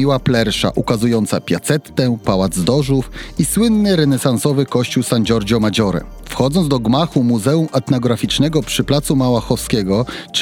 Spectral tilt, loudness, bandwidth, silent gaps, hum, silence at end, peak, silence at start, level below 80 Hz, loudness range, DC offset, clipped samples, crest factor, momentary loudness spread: -5.5 dB/octave; -16 LUFS; 17.5 kHz; none; none; 0 s; -2 dBFS; 0 s; -36 dBFS; 1 LU; under 0.1%; under 0.1%; 14 dB; 4 LU